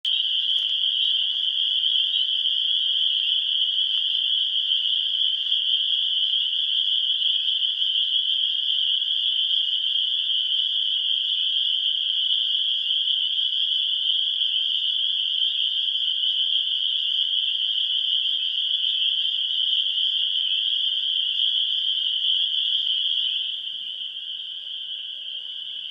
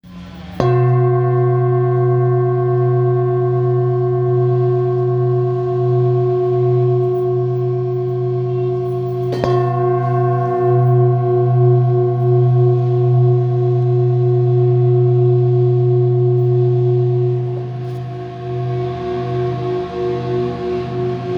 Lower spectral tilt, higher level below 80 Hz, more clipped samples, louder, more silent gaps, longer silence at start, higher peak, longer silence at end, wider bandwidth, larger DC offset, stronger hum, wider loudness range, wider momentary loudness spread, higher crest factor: second, 3 dB/octave vs -11 dB/octave; second, under -90 dBFS vs -48 dBFS; neither; second, -20 LUFS vs -16 LUFS; neither; about the same, 0.05 s vs 0.05 s; second, -10 dBFS vs 0 dBFS; about the same, 0 s vs 0 s; first, 7.4 kHz vs 4.9 kHz; neither; neither; second, 1 LU vs 5 LU; second, 2 LU vs 8 LU; about the same, 14 dB vs 14 dB